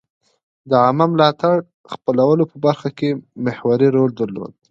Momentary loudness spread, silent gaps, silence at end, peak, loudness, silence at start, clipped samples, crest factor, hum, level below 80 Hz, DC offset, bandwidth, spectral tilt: 10 LU; 1.74-1.84 s; 0.25 s; 0 dBFS; -17 LUFS; 0.65 s; under 0.1%; 18 dB; none; -62 dBFS; under 0.1%; 7.6 kHz; -8.5 dB/octave